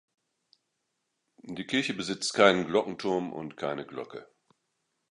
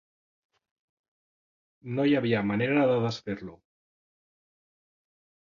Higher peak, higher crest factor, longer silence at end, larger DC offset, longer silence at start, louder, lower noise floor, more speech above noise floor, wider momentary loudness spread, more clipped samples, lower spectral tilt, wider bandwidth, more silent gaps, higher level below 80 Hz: first, -4 dBFS vs -12 dBFS; first, 26 dB vs 18 dB; second, 0.85 s vs 2 s; neither; second, 1.45 s vs 1.85 s; about the same, -28 LUFS vs -27 LUFS; second, -81 dBFS vs under -90 dBFS; second, 52 dB vs over 64 dB; first, 19 LU vs 13 LU; neither; second, -4 dB/octave vs -7.5 dB/octave; first, 11.5 kHz vs 7.2 kHz; neither; about the same, -70 dBFS vs -66 dBFS